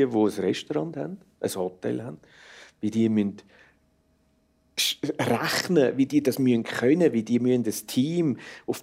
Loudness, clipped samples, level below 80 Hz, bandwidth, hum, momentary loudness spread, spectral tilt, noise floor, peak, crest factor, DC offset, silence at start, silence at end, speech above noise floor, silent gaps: -25 LUFS; under 0.1%; -68 dBFS; 16 kHz; none; 11 LU; -5 dB/octave; -66 dBFS; -8 dBFS; 18 dB; under 0.1%; 0 s; 0 s; 41 dB; none